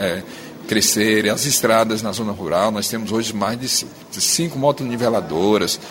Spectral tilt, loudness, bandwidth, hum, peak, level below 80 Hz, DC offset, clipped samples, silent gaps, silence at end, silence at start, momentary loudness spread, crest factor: -3 dB/octave; -18 LUFS; 16.5 kHz; none; -2 dBFS; -54 dBFS; under 0.1%; under 0.1%; none; 0 s; 0 s; 9 LU; 18 dB